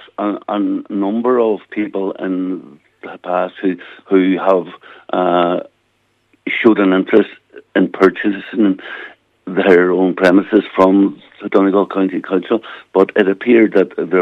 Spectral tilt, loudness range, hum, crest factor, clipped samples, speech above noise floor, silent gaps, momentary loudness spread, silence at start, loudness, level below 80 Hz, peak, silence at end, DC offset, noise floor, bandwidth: -8 dB/octave; 5 LU; none; 14 dB; under 0.1%; 47 dB; none; 13 LU; 0.2 s; -15 LUFS; -62 dBFS; 0 dBFS; 0 s; under 0.1%; -62 dBFS; 6.4 kHz